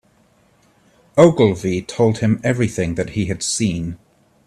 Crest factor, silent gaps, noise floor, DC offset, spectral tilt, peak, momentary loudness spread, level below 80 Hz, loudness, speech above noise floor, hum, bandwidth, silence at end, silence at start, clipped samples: 18 dB; none; -56 dBFS; under 0.1%; -5.5 dB/octave; 0 dBFS; 10 LU; -48 dBFS; -18 LUFS; 40 dB; none; 13 kHz; 0.5 s; 1.15 s; under 0.1%